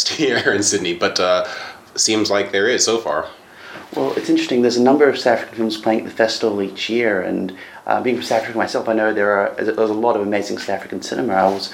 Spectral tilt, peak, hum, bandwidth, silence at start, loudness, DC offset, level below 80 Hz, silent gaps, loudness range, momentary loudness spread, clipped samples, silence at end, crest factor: -3 dB/octave; 0 dBFS; none; 16.5 kHz; 0 s; -18 LUFS; under 0.1%; -62 dBFS; none; 2 LU; 10 LU; under 0.1%; 0 s; 18 dB